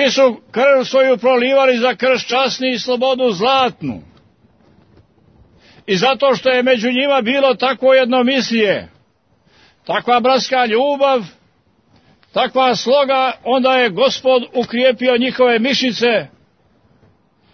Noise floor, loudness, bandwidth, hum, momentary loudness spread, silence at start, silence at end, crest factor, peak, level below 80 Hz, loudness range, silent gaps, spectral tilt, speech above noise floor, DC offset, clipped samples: -57 dBFS; -14 LUFS; 6.6 kHz; none; 7 LU; 0 s; 1.3 s; 14 dB; -2 dBFS; -60 dBFS; 4 LU; none; -4 dB/octave; 43 dB; under 0.1%; under 0.1%